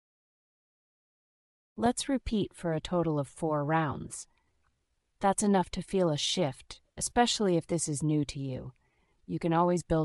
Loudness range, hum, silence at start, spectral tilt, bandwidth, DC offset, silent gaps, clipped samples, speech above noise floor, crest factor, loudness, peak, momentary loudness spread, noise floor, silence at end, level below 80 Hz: 4 LU; none; 1.75 s; -5 dB/octave; 12 kHz; under 0.1%; none; under 0.1%; 47 dB; 22 dB; -30 LUFS; -10 dBFS; 13 LU; -77 dBFS; 0 s; -52 dBFS